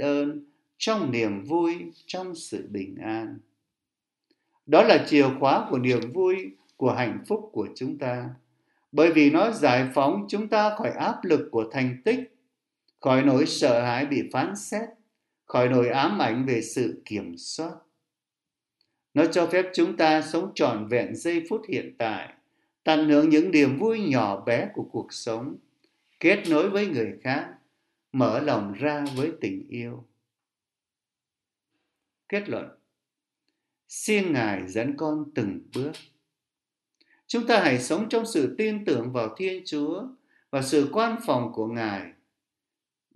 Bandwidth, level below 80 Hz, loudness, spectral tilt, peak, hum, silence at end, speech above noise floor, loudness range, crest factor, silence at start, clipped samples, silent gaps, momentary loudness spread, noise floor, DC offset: 12 kHz; -72 dBFS; -25 LUFS; -5.5 dB/octave; -2 dBFS; none; 1.05 s; over 66 dB; 8 LU; 24 dB; 0 s; under 0.1%; none; 14 LU; under -90 dBFS; under 0.1%